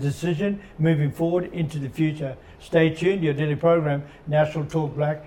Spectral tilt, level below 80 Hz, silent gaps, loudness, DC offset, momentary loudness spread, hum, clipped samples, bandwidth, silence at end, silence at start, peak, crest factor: -7.5 dB/octave; -52 dBFS; none; -24 LUFS; under 0.1%; 8 LU; none; under 0.1%; 12 kHz; 0 s; 0 s; -8 dBFS; 16 dB